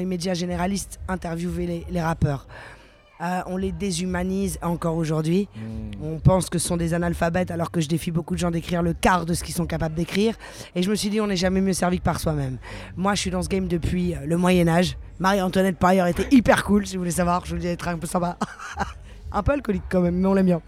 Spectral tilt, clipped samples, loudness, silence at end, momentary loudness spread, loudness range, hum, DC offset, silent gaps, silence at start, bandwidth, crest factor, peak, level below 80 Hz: -5.5 dB/octave; under 0.1%; -23 LUFS; 0.05 s; 11 LU; 7 LU; none; under 0.1%; none; 0 s; 15.5 kHz; 20 dB; -2 dBFS; -38 dBFS